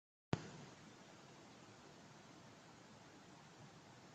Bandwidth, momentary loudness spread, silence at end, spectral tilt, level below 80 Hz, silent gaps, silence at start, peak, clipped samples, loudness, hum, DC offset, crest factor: 8.8 kHz; 14 LU; 0 s; -5.5 dB/octave; -78 dBFS; none; 0.3 s; -18 dBFS; under 0.1%; -55 LUFS; none; under 0.1%; 36 dB